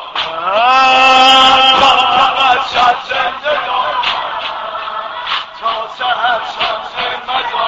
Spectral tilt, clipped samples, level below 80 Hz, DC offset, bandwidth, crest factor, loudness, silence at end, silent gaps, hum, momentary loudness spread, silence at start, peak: -1.5 dB/octave; under 0.1%; -46 dBFS; under 0.1%; 9.8 kHz; 12 dB; -11 LUFS; 0 s; none; none; 14 LU; 0 s; 0 dBFS